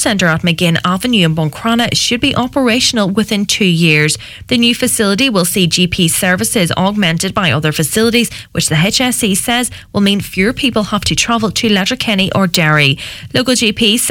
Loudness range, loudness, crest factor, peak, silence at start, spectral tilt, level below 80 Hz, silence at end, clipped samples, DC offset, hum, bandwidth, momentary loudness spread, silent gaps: 2 LU; -12 LUFS; 12 dB; 0 dBFS; 0 s; -3.5 dB/octave; -38 dBFS; 0 s; under 0.1%; under 0.1%; none; 18 kHz; 4 LU; none